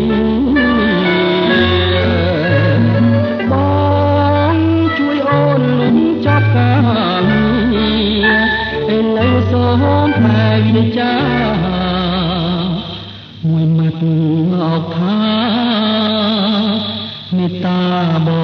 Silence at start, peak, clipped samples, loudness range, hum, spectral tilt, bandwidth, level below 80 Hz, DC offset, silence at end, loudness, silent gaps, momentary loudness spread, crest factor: 0 s; 0 dBFS; under 0.1%; 3 LU; none; -9 dB/octave; 6 kHz; -36 dBFS; under 0.1%; 0 s; -13 LUFS; none; 5 LU; 12 dB